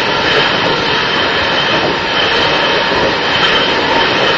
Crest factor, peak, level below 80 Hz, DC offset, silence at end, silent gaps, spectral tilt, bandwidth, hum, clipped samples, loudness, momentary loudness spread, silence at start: 12 dB; 0 dBFS; -40 dBFS; 0.3%; 0 s; none; -3.5 dB/octave; 7.8 kHz; none; under 0.1%; -11 LUFS; 2 LU; 0 s